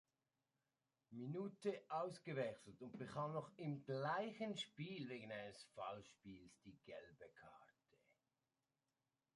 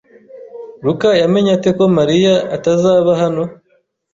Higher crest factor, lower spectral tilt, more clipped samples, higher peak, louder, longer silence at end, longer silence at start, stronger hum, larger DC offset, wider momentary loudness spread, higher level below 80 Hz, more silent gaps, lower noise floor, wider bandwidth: first, 20 dB vs 12 dB; about the same, -6 dB/octave vs -6.5 dB/octave; neither; second, -32 dBFS vs -2 dBFS; second, -49 LUFS vs -13 LUFS; first, 1.7 s vs 0.6 s; first, 1.1 s vs 0.35 s; neither; neither; first, 17 LU vs 10 LU; second, -86 dBFS vs -52 dBFS; neither; first, under -90 dBFS vs -59 dBFS; first, 11 kHz vs 7.6 kHz